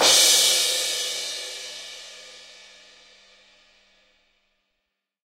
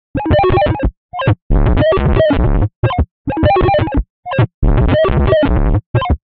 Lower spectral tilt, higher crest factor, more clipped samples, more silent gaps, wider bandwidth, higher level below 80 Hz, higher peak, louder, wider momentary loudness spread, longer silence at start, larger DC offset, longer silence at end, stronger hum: second, 2.5 dB/octave vs -6.5 dB/octave; first, 22 dB vs 12 dB; neither; second, none vs 0.97-1.09 s, 1.42-1.50 s, 2.76-2.83 s, 3.11-3.25 s, 4.10-4.23 s, 4.54-4.62 s, 5.86-5.94 s; first, 16 kHz vs 4.7 kHz; second, -70 dBFS vs -18 dBFS; about the same, -2 dBFS vs 0 dBFS; second, -19 LUFS vs -14 LUFS; first, 26 LU vs 7 LU; second, 0 s vs 0.15 s; neither; first, 2.9 s vs 0.1 s; neither